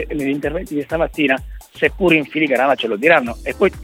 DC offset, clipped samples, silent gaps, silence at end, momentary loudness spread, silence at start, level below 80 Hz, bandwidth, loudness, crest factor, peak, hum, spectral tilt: under 0.1%; under 0.1%; none; 0 s; 9 LU; 0 s; -36 dBFS; 16.5 kHz; -17 LUFS; 16 dB; 0 dBFS; none; -5.5 dB/octave